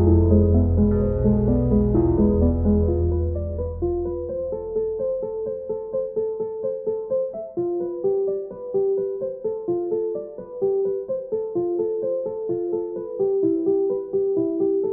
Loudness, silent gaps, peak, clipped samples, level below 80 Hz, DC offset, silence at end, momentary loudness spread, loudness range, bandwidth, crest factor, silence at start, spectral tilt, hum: -23 LUFS; none; -6 dBFS; under 0.1%; -32 dBFS; under 0.1%; 0 s; 9 LU; 6 LU; 1.9 kHz; 16 dB; 0 s; -15 dB/octave; none